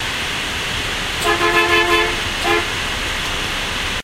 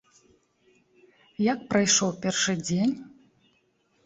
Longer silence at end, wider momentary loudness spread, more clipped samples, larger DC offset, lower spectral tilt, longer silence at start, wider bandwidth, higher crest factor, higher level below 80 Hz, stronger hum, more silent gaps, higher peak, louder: second, 0 s vs 0.95 s; about the same, 7 LU vs 8 LU; neither; neither; about the same, -2.5 dB/octave vs -3.5 dB/octave; second, 0 s vs 1.4 s; first, 16 kHz vs 8.4 kHz; about the same, 16 dB vs 20 dB; first, -32 dBFS vs -64 dBFS; neither; neither; first, -2 dBFS vs -8 dBFS; first, -17 LUFS vs -25 LUFS